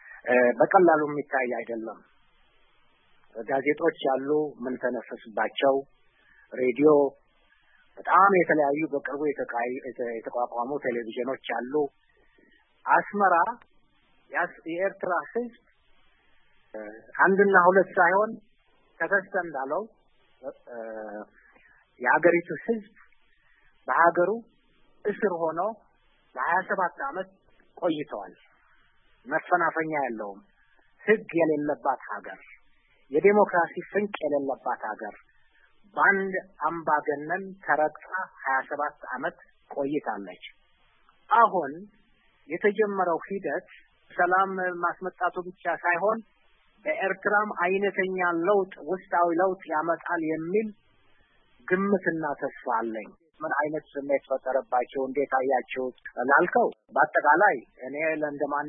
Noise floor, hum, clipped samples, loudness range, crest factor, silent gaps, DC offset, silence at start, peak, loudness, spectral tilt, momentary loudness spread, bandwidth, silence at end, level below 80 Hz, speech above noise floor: -64 dBFS; none; under 0.1%; 6 LU; 22 dB; none; under 0.1%; 0.05 s; -6 dBFS; -26 LUFS; -10 dB/octave; 17 LU; 3.7 kHz; 0 s; -70 dBFS; 38 dB